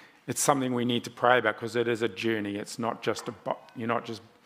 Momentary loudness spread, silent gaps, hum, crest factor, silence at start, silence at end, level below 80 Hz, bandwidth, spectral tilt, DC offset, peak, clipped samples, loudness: 11 LU; none; none; 24 dB; 0 s; 0.25 s; -76 dBFS; 16 kHz; -4 dB/octave; under 0.1%; -4 dBFS; under 0.1%; -29 LUFS